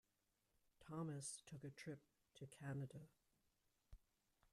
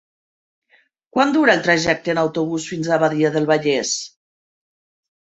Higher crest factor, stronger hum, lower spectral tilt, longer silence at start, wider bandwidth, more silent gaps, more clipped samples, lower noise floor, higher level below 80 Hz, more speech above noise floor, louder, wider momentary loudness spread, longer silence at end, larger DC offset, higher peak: about the same, 18 dB vs 20 dB; neither; about the same, -5 dB/octave vs -4 dB/octave; second, 0.8 s vs 1.15 s; first, 13.5 kHz vs 8.4 kHz; neither; neither; first, -88 dBFS vs -59 dBFS; second, -78 dBFS vs -58 dBFS; second, 34 dB vs 42 dB; second, -54 LUFS vs -18 LUFS; first, 12 LU vs 9 LU; second, 0.55 s vs 1.15 s; neither; second, -40 dBFS vs -2 dBFS